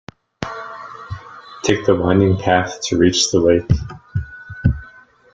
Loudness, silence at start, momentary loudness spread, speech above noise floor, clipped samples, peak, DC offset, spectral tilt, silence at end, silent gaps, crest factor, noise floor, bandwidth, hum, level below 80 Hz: -17 LUFS; 0.4 s; 18 LU; 30 dB; under 0.1%; 0 dBFS; under 0.1%; -5 dB/octave; 0.45 s; none; 18 dB; -45 dBFS; 9.4 kHz; none; -36 dBFS